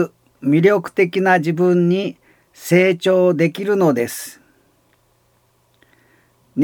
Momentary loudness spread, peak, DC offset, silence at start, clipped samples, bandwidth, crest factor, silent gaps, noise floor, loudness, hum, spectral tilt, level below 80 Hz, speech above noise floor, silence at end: 13 LU; -2 dBFS; under 0.1%; 0 s; under 0.1%; 19 kHz; 16 dB; none; -60 dBFS; -16 LUFS; none; -6.5 dB/octave; -70 dBFS; 44 dB; 0 s